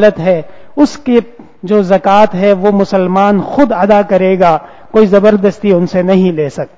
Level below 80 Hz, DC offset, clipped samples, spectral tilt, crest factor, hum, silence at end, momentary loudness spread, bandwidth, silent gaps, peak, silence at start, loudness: -44 dBFS; under 0.1%; 1%; -7.5 dB/octave; 10 dB; none; 0.1 s; 6 LU; 8 kHz; none; 0 dBFS; 0 s; -10 LUFS